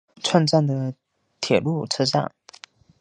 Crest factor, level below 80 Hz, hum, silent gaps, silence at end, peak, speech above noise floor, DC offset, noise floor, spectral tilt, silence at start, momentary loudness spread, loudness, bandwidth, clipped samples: 22 dB; -62 dBFS; none; none; 0.75 s; -2 dBFS; 28 dB; under 0.1%; -49 dBFS; -5.5 dB/octave; 0.25 s; 13 LU; -22 LUFS; 10 kHz; under 0.1%